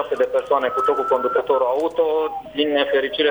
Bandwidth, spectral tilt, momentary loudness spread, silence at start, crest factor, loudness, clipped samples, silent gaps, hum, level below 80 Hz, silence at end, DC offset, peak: over 20 kHz; -4.5 dB/octave; 2 LU; 0 s; 14 dB; -20 LUFS; under 0.1%; none; none; -58 dBFS; 0 s; under 0.1%; -4 dBFS